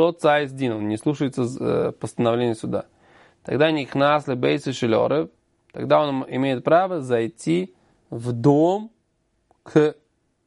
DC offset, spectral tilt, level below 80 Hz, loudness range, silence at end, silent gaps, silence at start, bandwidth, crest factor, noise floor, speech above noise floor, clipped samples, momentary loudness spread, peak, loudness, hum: under 0.1%; -6.5 dB/octave; -62 dBFS; 2 LU; 0.55 s; none; 0 s; 11.5 kHz; 18 dB; -69 dBFS; 48 dB; under 0.1%; 10 LU; -4 dBFS; -22 LUFS; none